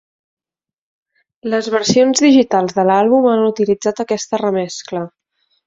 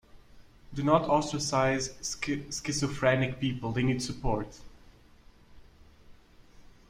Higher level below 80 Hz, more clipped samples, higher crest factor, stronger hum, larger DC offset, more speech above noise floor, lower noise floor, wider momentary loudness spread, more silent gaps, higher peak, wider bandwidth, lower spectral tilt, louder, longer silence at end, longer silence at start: second, -58 dBFS vs -48 dBFS; neither; second, 14 dB vs 22 dB; neither; neither; first, 74 dB vs 27 dB; first, -88 dBFS vs -56 dBFS; first, 13 LU vs 8 LU; neither; first, -2 dBFS vs -10 dBFS; second, 8 kHz vs 15.5 kHz; about the same, -4.5 dB/octave vs -5 dB/octave; first, -15 LUFS vs -29 LUFS; first, 0.6 s vs 0.3 s; first, 1.45 s vs 0.15 s